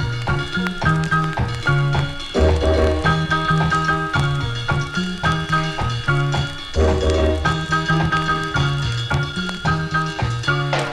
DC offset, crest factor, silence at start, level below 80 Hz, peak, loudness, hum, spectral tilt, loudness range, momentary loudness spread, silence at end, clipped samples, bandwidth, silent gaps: under 0.1%; 16 dB; 0 s; -28 dBFS; -4 dBFS; -20 LUFS; none; -6 dB/octave; 2 LU; 5 LU; 0 s; under 0.1%; 11.5 kHz; none